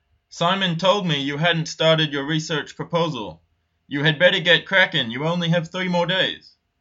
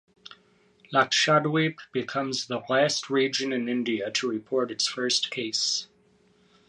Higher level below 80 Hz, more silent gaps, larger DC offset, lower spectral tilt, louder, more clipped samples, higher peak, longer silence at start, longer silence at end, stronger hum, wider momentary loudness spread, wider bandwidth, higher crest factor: first, -62 dBFS vs -76 dBFS; neither; neither; first, -4.5 dB/octave vs -3 dB/octave; first, -20 LUFS vs -26 LUFS; neither; first, -2 dBFS vs -8 dBFS; about the same, 0.35 s vs 0.3 s; second, 0.4 s vs 0.85 s; neither; about the same, 10 LU vs 8 LU; second, 7.8 kHz vs 11.5 kHz; about the same, 20 dB vs 20 dB